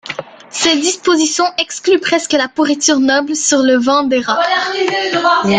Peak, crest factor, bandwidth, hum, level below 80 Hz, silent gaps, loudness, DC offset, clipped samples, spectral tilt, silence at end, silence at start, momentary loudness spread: 0 dBFS; 14 dB; 10 kHz; none; -56 dBFS; none; -13 LUFS; under 0.1%; under 0.1%; -2 dB/octave; 0 s; 0.05 s; 4 LU